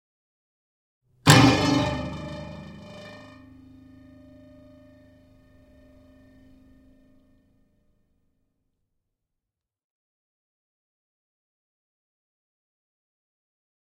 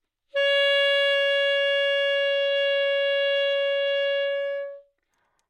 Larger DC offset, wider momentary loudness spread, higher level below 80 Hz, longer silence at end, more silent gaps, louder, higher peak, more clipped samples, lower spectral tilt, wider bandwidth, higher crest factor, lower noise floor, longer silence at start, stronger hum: neither; first, 27 LU vs 8 LU; first, -52 dBFS vs -82 dBFS; first, 10.75 s vs 0.7 s; neither; about the same, -20 LUFS vs -22 LUFS; first, 0 dBFS vs -12 dBFS; neither; first, -4.5 dB/octave vs 3 dB/octave; first, 16 kHz vs 10 kHz; first, 30 dB vs 12 dB; first, -87 dBFS vs -72 dBFS; first, 1.25 s vs 0.35 s; neither